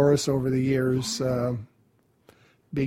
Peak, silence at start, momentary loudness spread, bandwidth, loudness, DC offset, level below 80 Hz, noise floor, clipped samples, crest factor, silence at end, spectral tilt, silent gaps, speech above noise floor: -8 dBFS; 0 s; 9 LU; 16 kHz; -26 LUFS; under 0.1%; -54 dBFS; -65 dBFS; under 0.1%; 18 dB; 0 s; -6 dB/octave; none; 41 dB